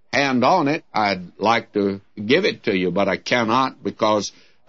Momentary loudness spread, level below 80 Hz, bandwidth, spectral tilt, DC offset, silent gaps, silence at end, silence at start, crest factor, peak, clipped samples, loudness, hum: 6 LU; -62 dBFS; 7.8 kHz; -5 dB/octave; 0.2%; none; 0.4 s; 0.1 s; 18 dB; -2 dBFS; under 0.1%; -20 LUFS; none